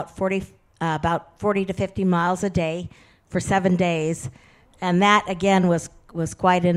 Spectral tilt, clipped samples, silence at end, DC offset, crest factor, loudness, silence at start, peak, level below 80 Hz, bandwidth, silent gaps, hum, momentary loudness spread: -6 dB/octave; under 0.1%; 0 s; under 0.1%; 18 dB; -22 LUFS; 0 s; -4 dBFS; -50 dBFS; 12 kHz; none; none; 11 LU